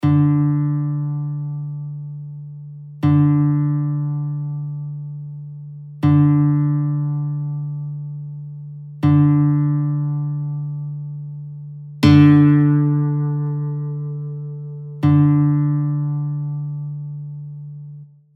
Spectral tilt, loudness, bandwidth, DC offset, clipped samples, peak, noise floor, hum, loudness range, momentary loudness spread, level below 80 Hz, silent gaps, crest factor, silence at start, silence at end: -9.5 dB/octave; -18 LUFS; 5.8 kHz; under 0.1%; under 0.1%; 0 dBFS; -39 dBFS; none; 4 LU; 19 LU; -54 dBFS; none; 18 dB; 0 s; 0.3 s